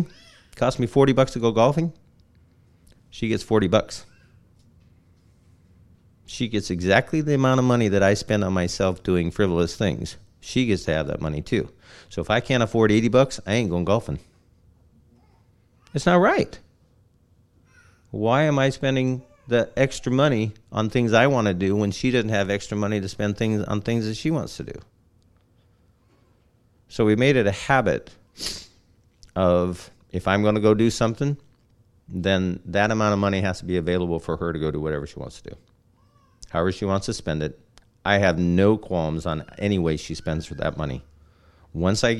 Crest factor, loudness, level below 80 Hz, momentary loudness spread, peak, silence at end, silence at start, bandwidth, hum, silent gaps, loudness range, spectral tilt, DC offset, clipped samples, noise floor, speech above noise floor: 22 dB; -23 LUFS; -46 dBFS; 13 LU; -2 dBFS; 0 s; 0 s; 12.5 kHz; none; none; 6 LU; -6 dB/octave; under 0.1%; under 0.1%; -60 dBFS; 39 dB